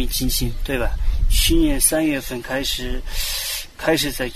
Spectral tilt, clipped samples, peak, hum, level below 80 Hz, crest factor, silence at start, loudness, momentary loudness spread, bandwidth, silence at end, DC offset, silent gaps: -3 dB/octave; under 0.1%; -4 dBFS; none; -24 dBFS; 16 dB; 0 s; -21 LUFS; 9 LU; 14 kHz; 0 s; under 0.1%; none